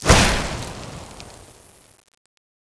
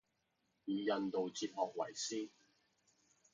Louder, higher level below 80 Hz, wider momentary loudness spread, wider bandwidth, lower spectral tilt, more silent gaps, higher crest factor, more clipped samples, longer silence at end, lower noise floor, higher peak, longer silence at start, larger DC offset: first, -19 LUFS vs -41 LUFS; first, -30 dBFS vs -88 dBFS; first, 26 LU vs 8 LU; first, 11 kHz vs 9.6 kHz; about the same, -3.5 dB/octave vs -3.5 dB/octave; neither; about the same, 22 dB vs 20 dB; neither; first, 1.45 s vs 1.05 s; second, -49 dBFS vs -83 dBFS; first, 0 dBFS vs -22 dBFS; second, 0 s vs 0.65 s; neither